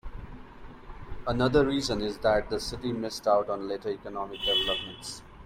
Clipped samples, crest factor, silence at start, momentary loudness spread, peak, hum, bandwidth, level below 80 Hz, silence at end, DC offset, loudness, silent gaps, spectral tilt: under 0.1%; 18 dB; 0.05 s; 21 LU; -10 dBFS; none; 16 kHz; -46 dBFS; 0 s; under 0.1%; -28 LUFS; none; -4.5 dB/octave